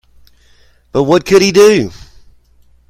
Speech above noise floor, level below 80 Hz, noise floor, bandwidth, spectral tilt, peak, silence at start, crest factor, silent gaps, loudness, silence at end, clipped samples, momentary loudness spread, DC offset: 39 dB; -44 dBFS; -48 dBFS; 15.5 kHz; -4.5 dB/octave; 0 dBFS; 0.95 s; 14 dB; none; -10 LUFS; 1 s; 0.2%; 12 LU; under 0.1%